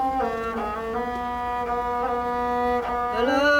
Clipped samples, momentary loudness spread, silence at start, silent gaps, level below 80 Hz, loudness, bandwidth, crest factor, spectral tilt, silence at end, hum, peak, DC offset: under 0.1%; 5 LU; 0 s; none; -44 dBFS; -25 LUFS; 17.5 kHz; 16 dB; -5 dB/octave; 0 s; none; -10 dBFS; under 0.1%